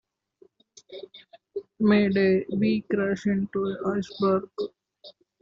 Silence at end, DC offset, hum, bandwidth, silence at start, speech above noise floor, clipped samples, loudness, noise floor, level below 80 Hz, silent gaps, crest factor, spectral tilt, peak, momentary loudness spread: 0.3 s; under 0.1%; none; 7.4 kHz; 0.9 s; 35 dB; under 0.1%; -25 LUFS; -60 dBFS; -64 dBFS; none; 16 dB; -6 dB/octave; -10 dBFS; 22 LU